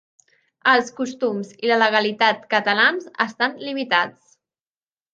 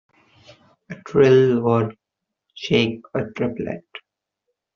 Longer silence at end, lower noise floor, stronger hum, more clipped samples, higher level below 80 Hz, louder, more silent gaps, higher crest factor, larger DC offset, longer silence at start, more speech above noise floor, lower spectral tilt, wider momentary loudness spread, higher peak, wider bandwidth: first, 1.05 s vs 0.8 s; first, under -90 dBFS vs -83 dBFS; neither; neither; second, -76 dBFS vs -58 dBFS; about the same, -20 LUFS vs -20 LUFS; neither; about the same, 20 dB vs 18 dB; neither; second, 0.65 s vs 0.9 s; first, over 70 dB vs 64 dB; second, -3.5 dB/octave vs -5.5 dB/octave; second, 8 LU vs 24 LU; about the same, -2 dBFS vs -4 dBFS; first, 9 kHz vs 7 kHz